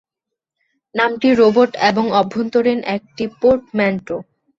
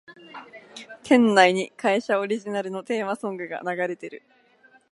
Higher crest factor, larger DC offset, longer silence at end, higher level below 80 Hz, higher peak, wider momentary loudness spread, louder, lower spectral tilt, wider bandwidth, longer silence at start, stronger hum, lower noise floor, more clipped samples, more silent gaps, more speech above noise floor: second, 16 dB vs 22 dB; neither; second, 0.35 s vs 0.75 s; first, -54 dBFS vs -76 dBFS; about the same, -2 dBFS vs -2 dBFS; second, 13 LU vs 25 LU; first, -16 LUFS vs -23 LUFS; first, -6 dB/octave vs -4.5 dB/octave; second, 7.6 kHz vs 11.5 kHz; first, 0.95 s vs 0.1 s; neither; first, -83 dBFS vs -58 dBFS; neither; neither; first, 67 dB vs 34 dB